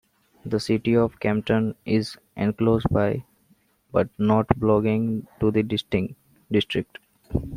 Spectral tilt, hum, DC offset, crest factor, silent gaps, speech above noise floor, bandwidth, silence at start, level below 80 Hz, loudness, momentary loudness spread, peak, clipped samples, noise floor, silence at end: -7.5 dB/octave; none; under 0.1%; 22 dB; none; 40 dB; 15 kHz; 0.45 s; -46 dBFS; -24 LUFS; 9 LU; -2 dBFS; under 0.1%; -63 dBFS; 0 s